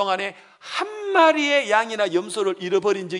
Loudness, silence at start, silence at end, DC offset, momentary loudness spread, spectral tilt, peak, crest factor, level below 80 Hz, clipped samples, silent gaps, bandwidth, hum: -21 LUFS; 0 s; 0 s; under 0.1%; 11 LU; -3.5 dB/octave; -2 dBFS; 20 dB; -82 dBFS; under 0.1%; none; 11 kHz; none